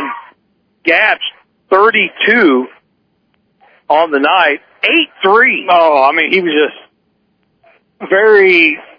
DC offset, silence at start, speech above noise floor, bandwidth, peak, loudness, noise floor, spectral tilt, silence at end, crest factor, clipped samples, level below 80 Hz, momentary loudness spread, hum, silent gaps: under 0.1%; 0 s; 50 dB; 5.4 kHz; 0 dBFS; -10 LUFS; -60 dBFS; -6 dB/octave; 0.2 s; 12 dB; 0.2%; -60 dBFS; 10 LU; none; none